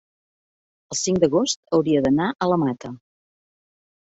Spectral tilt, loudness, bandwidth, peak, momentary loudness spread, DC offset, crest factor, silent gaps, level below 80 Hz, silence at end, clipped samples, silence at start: -5 dB/octave; -21 LUFS; 8.2 kHz; -4 dBFS; 10 LU; under 0.1%; 20 dB; 1.56-1.63 s; -56 dBFS; 1.1 s; under 0.1%; 0.9 s